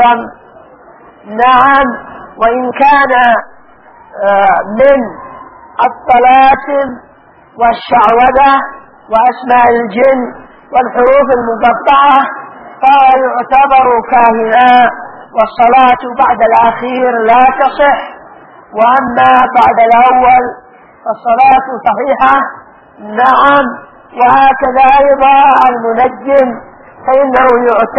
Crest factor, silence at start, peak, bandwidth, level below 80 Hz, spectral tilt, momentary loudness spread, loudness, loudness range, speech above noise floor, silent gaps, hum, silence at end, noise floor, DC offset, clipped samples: 8 dB; 0 s; 0 dBFS; 5.6 kHz; -40 dBFS; -6.5 dB/octave; 12 LU; -8 LUFS; 3 LU; 33 dB; none; none; 0 s; -41 dBFS; under 0.1%; 0.3%